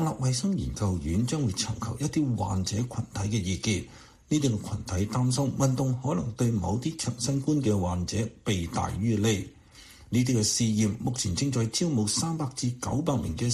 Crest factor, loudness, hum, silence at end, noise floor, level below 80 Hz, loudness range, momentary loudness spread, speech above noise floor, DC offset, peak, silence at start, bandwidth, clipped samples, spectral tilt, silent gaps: 14 dB; -28 LUFS; none; 0 s; -51 dBFS; -48 dBFS; 2 LU; 5 LU; 24 dB; under 0.1%; -14 dBFS; 0 s; 13.5 kHz; under 0.1%; -5 dB/octave; none